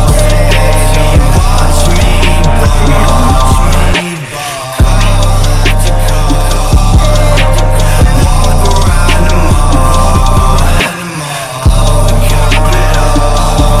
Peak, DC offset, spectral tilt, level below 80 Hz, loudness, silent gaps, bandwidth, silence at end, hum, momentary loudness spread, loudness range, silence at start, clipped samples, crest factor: 0 dBFS; under 0.1%; -5 dB/octave; -8 dBFS; -9 LUFS; none; 15 kHz; 0 s; none; 3 LU; 2 LU; 0 s; 0.9%; 6 dB